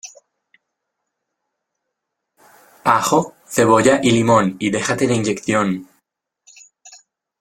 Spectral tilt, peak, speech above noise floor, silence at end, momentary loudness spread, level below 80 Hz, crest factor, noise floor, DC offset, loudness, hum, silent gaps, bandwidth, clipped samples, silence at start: -5 dB/octave; 0 dBFS; 62 dB; 0.45 s; 10 LU; -56 dBFS; 18 dB; -78 dBFS; under 0.1%; -17 LUFS; none; none; 16.5 kHz; under 0.1%; 0.05 s